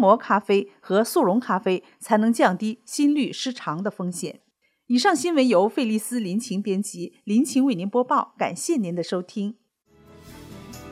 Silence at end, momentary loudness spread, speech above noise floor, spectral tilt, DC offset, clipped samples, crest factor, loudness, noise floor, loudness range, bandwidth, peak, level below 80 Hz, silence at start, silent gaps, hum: 0 s; 11 LU; 34 dB; -5 dB/octave; under 0.1%; under 0.1%; 20 dB; -23 LUFS; -56 dBFS; 3 LU; 16 kHz; -4 dBFS; -66 dBFS; 0 s; none; none